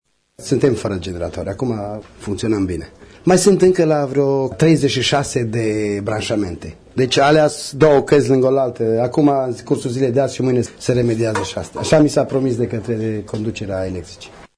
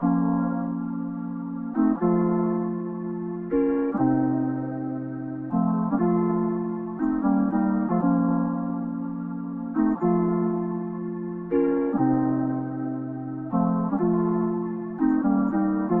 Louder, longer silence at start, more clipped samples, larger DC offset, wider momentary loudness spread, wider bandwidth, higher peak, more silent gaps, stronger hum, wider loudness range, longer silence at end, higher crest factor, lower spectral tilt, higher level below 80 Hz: first, -17 LUFS vs -25 LUFS; first, 0.4 s vs 0 s; neither; neither; first, 12 LU vs 9 LU; first, 11 kHz vs 2.9 kHz; first, 0 dBFS vs -10 dBFS; neither; neither; about the same, 4 LU vs 2 LU; about the same, 0.1 s vs 0 s; about the same, 16 dB vs 14 dB; second, -5.5 dB/octave vs -13.5 dB/octave; first, -44 dBFS vs -54 dBFS